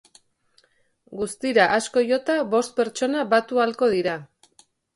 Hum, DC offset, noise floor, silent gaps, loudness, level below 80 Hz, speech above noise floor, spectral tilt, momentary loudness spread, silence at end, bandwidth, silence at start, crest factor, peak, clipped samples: none; under 0.1%; -63 dBFS; none; -22 LUFS; -64 dBFS; 41 dB; -4 dB/octave; 11 LU; 0.7 s; 11.5 kHz; 1.1 s; 18 dB; -4 dBFS; under 0.1%